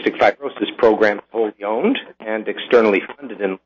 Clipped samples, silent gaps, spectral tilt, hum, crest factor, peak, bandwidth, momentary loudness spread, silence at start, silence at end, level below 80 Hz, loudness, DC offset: under 0.1%; none; -6 dB/octave; none; 16 dB; -4 dBFS; 7.2 kHz; 10 LU; 0 s; 0.1 s; -60 dBFS; -18 LUFS; under 0.1%